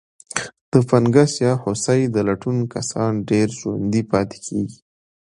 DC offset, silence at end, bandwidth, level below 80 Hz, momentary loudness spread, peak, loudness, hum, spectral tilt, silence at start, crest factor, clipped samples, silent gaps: under 0.1%; 0.65 s; 11 kHz; -52 dBFS; 11 LU; 0 dBFS; -20 LUFS; none; -6 dB/octave; 0.35 s; 20 dB; under 0.1%; 0.61-0.72 s